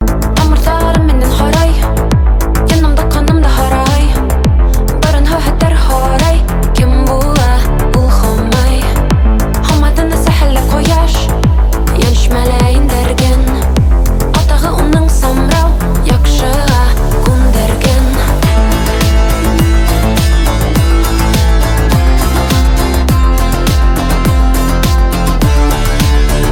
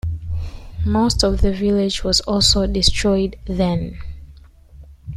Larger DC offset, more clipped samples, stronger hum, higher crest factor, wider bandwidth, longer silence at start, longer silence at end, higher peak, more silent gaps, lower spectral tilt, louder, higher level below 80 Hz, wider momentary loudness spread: neither; neither; neither; second, 8 dB vs 18 dB; first, 17 kHz vs 15 kHz; about the same, 0 s vs 0.05 s; about the same, 0 s vs 0 s; about the same, 0 dBFS vs -2 dBFS; neither; about the same, -5.5 dB/octave vs -4.5 dB/octave; first, -11 LUFS vs -18 LUFS; first, -10 dBFS vs -28 dBFS; second, 2 LU vs 16 LU